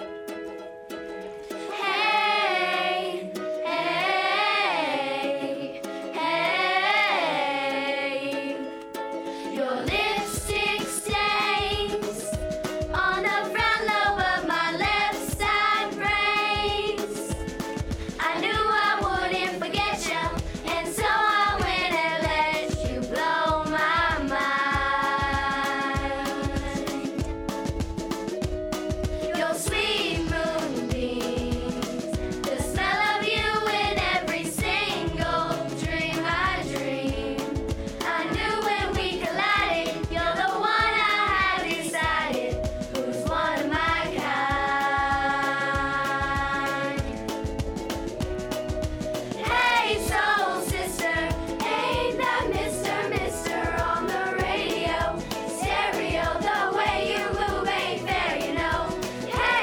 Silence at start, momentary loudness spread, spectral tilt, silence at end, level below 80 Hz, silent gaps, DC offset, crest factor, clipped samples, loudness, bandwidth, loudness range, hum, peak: 0 s; 9 LU; -4 dB/octave; 0 s; -40 dBFS; none; under 0.1%; 16 dB; under 0.1%; -25 LUFS; 19 kHz; 4 LU; none; -10 dBFS